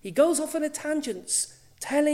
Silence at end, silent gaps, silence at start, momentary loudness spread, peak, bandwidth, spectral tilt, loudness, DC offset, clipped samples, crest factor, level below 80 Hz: 0 s; none; 0.05 s; 9 LU; -10 dBFS; 16 kHz; -2.5 dB/octave; -26 LUFS; under 0.1%; under 0.1%; 16 dB; -66 dBFS